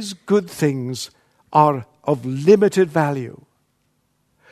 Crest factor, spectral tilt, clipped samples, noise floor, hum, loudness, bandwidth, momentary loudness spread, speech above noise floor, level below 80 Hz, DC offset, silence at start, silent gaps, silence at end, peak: 20 dB; -6.5 dB/octave; under 0.1%; -67 dBFS; none; -19 LUFS; 13.5 kHz; 14 LU; 49 dB; -64 dBFS; under 0.1%; 0 s; none; 1.2 s; 0 dBFS